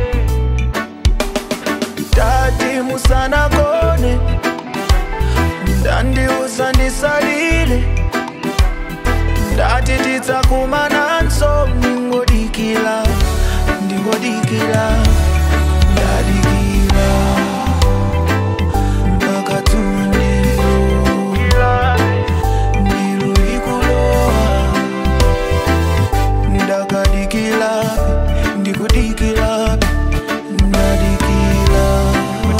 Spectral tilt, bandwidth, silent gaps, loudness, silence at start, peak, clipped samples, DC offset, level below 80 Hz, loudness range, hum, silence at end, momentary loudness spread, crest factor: -5.5 dB/octave; 16.5 kHz; none; -15 LUFS; 0 s; 0 dBFS; under 0.1%; 0.8%; -16 dBFS; 2 LU; none; 0 s; 4 LU; 14 dB